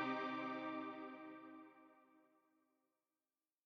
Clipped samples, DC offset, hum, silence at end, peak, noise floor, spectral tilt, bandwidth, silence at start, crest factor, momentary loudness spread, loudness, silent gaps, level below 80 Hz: under 0.1%; under 0.1%; none; 1.45 s; -30 dBFS; under -90 dBFS; -6 dB/octave; 7.2 kHz; 0 s; 20 dB; 21 LU; -47 LUFS; none; under -90 dBFS